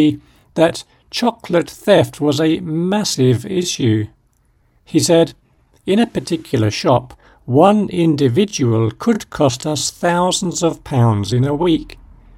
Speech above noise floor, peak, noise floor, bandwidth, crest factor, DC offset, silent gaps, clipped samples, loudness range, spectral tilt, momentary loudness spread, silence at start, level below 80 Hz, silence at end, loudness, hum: 42 dB; 0 dBFS; -57 dBFS; 16 kHz; 16 dB; under 0.1%; none; under 0.1%; 2 LU; -5.5 dB/octave; 7 LU; 0 s; -46 dBFS; 0.45 s; -16 LUFS; none